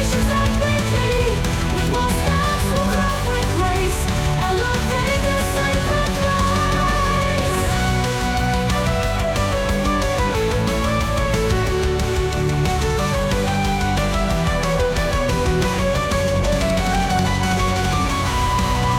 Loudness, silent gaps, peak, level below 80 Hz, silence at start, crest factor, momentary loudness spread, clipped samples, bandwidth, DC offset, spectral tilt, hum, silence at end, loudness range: -19 LUFS; none; -8 dBFS; -26 dBFS; 0 s; 12 dB; 2 LU; under 0.1%; 17 kHz; under 0.1%; -5 dB/octave; none; 0 s; 1 LU